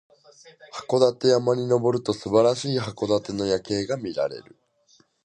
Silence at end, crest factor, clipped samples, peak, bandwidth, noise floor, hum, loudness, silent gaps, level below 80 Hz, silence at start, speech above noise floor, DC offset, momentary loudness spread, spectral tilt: 0.85 s; 20 dB; under 0.1%; -4 dBFS; 10.5 kHz; -61 dBFS; none; -23 LUFS; none; -60 dBFS; 0.45 s; 38 dB; under 0.1%; 9 LU; -5.5 dB/octave